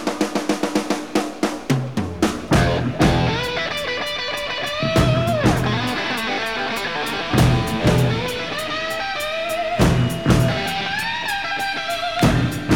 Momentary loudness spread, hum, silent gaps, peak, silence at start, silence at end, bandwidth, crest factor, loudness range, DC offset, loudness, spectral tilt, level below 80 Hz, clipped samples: 6 LU; none; none; -2 dBFS; 0 s; 0 s; 18.5 kHz; 18 dB; 1 LU; 0.7%; -20 LUFS; -5.5 dB/octave; -34 dBFS; under 0.1%